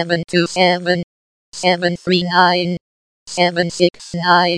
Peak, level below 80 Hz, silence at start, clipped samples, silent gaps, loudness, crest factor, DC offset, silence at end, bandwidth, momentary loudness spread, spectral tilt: 0 dBFS; -56 dBFS; 0 s; under 0.1%; 1.03-1.52 s, 2.81-3.26 s; -16 LUFS; 16 dB; under 0.1%; 0 s; 10.5 kHz; 11 LU; -4.5 dB/octave